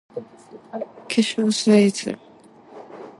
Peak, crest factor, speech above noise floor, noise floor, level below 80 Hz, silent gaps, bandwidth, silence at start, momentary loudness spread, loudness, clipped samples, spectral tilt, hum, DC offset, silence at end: -4 dBFS; 18 dB; 27 dB; -48 dBFS; -70 dBFS; none; 11.5 kHz; 0.15 s; 21 LU; -19 LUFS; under 0.1%; -5 dB/octave; none; under 0.1%; 0.1 s